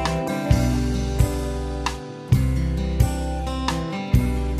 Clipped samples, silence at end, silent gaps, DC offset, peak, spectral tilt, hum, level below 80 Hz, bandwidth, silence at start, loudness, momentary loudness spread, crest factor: under 0.1%; 0 s; none; under 0.1%; -4 dBFS; -6.5 dB/octave; none; -26 dBFS; 14.5 kHz; 0 s; -23 LUFS; 7 LU; 16 dB